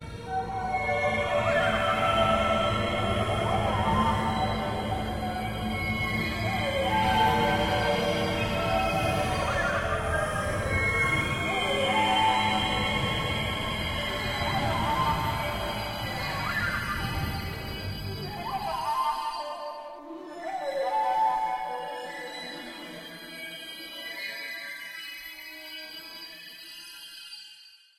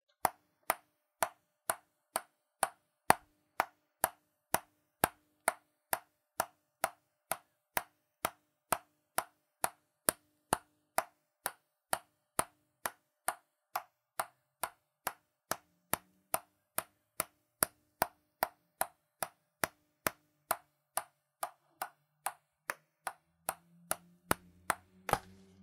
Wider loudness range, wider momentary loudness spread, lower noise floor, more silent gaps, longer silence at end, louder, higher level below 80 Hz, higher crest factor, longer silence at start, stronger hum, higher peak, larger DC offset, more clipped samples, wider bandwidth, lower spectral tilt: first, 12 LU vs 5 LU; first, 15 LU vs 9 LU; second, -53 dBFS vs -57 dBFS; neither; about the same, 0.3 s vs 0.4 s; first, -28 LUFS vs -39 LUFS; first, -44 dBFS vs -70 dBFS; second, 16 dB vs 38 dB; second, 0 s vs 0.25 s; neither; second, -12 dBFS vs -4 dBFS; neither; neither; about the same, 16.5 kHz vs 16.5 kHz; first, -5 dB/octave vs -1.5 dB/octave